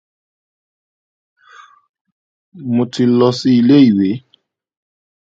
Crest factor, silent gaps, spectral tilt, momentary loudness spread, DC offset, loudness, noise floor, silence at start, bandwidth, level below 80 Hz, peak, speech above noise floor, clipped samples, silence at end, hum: 16 dB; none; -7 dB/octave; 12 LU; under 0.1%; -13 LUFS; -58 dBFS; 2.55 s; 7.6 kHz; -58 dBFS; 0 dBFS; 47 dB; under 0.1%; 1.05 s; none